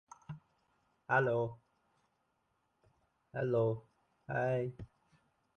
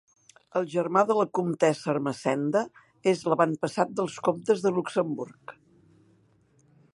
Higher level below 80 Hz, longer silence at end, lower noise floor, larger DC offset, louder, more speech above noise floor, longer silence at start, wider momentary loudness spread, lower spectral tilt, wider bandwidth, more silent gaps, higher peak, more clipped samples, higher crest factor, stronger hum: first, -70 dBFS vs -76 dBFS; second, 0.7 s vs 1.45 s; first, -80 dBFS vs -63 dBFS; neither; second, -36 LUFS vs -27 LUFS; first, 46 dB vs 37 dB; second, 0.3 s vs 0.55 s; first, 21 LU vs 8 LU; first, -8.5 dB/octave vs -6 dB/octave; second, 8.8 kHz vs 11.5 kHz; neither; second, -18 dBFS vs -6 dBFS; neither; about the same, 22 dB vs 20 dB; neither